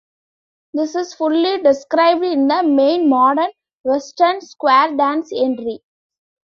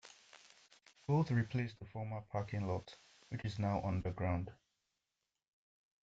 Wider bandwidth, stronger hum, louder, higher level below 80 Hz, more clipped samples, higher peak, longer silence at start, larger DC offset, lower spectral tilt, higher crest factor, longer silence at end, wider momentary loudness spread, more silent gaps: about the same, 7.4 kHz vs 7.8 kHz; neither; first, -16 LUFS vs -39 LUFS; about the same, -64 dBFS vs -64 dBFS; neither; first, -2 dBFS vs -22 dBFS; first, 0.75 s vs 0.05 s; neither; second, -3.5 dB/octave vs -8 dB/octave; about the same, 16 dB vs 18 dB; second, 0.75 s vs 1.5 s; second, 10 LU vs 22 LU; first, 3.73-3.84 s vs none